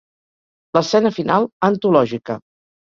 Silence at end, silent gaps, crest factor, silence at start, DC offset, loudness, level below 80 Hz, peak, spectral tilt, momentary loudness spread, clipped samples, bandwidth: 0.5 s; 1.53-1.60 s; 18 dB; 0.75 s; under 0.1%; -17 LUFS; -60 dBFS; 0 dBFS; -6 dB/octave; 12 LU; under 0.1%; 7.6 kHz